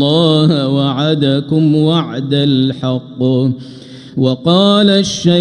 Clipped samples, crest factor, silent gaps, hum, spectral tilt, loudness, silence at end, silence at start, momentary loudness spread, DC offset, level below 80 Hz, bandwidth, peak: under 0.1%; 12 dB; none; none; -6.5 dB/octave; -13 LUFS; 0 s; 0 s; 9 LU; under 0.1%; -52 dBFS; 10 kHz; 0 dBFS